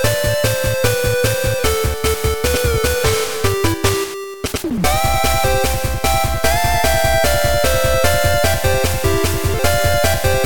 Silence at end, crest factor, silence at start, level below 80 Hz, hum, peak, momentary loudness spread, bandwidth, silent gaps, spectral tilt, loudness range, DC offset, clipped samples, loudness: 0 s; 14 dB; 0 s; -26 dBFS; none; -2 dBFS; 3 LU; 17.5 kHz; none; -4 dB/octave; 2 LU; 5%; under 0.1%; -16 LUFS